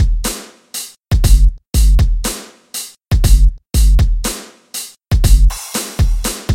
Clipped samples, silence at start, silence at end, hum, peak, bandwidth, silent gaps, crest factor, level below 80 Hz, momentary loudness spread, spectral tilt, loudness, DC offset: 0.1%; 0 s; 0 s; none; 0 dBFS; 16.5 kHz; none; 12 dB; -14 dBFS; 13 LU; -4.5 dB/octave; -16 LUFS; under 0.1%